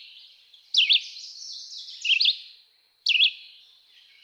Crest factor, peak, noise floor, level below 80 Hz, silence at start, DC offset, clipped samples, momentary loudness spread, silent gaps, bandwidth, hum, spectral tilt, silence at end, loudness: 18 dB; -10 dBFS; -61 dBFS; under -90 dBFS; 0.75 s; under 0.1%; under 0.1%; 19 LU; none; 12.5 kHz; none; 8 dB/octave; 0.85 s; -21 LUFS